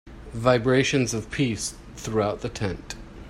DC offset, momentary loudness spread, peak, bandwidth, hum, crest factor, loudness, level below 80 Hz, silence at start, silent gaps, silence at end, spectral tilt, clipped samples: under 0.1%; 16 LU; -6 dBFS; 14.5 kHz; none; 18 dB; -25 LUFS; -44 dBFS; 0.05 s; none; 0 s; -5 dB/octave; under 0.1%